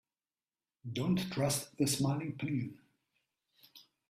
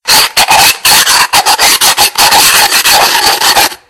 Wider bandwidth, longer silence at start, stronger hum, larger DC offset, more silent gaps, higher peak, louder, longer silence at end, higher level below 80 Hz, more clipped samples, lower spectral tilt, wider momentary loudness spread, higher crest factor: second, 15.5 kHz vs over 20 kHz; first, 0.85 s vs 0.05 s; neither; neither; neither; second, -20 dBFS vs 0 dBFS; second, -35 LUFS vs -4 LUFS; first, 0.3 s vs 0.15 s; second, -68 dBFS vs -38 dBFS; second, under 0.1% vs 4%; first, -5 dB/octave vs 1 dB/octave; first, 10 LU vs 2 LU; first, 18 dB vs 6 dB